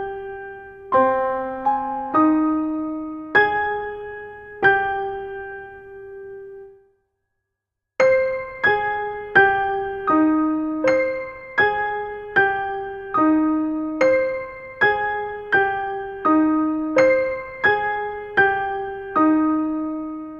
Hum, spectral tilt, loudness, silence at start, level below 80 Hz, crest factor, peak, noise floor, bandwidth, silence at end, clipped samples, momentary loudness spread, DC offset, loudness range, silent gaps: none; -6 dB/octave; -20 LUFS; 0 s; -52 dBFS; 20 dB; -2 dBFS; -82 dBFS; 7 kHz; 0 s; under 0.1%; 16 LU; under 0.1%; 6 LU; none